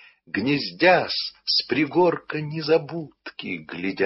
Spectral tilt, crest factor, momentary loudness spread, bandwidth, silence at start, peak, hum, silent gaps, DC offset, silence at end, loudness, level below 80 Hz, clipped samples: -7.5 dB/octave; 18 dB; 15 LU; 6 kHz; 0.35 s; -6 dBFS; none; none; under 0.1%; 0 s; -23 LUFS; -66 dBFS; under 0.1%